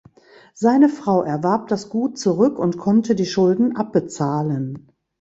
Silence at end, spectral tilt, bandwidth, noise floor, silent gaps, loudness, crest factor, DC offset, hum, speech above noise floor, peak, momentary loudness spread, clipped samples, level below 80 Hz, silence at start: 0.4 s; -7 dB/octave; 8 kHz; -50 dBFS; none; -19 LUFS; 16 dB; under 0.1%; none; 31 dB; -2 dBFS; 8 LU; under 0.1%; -60 dBFS; 0.55 s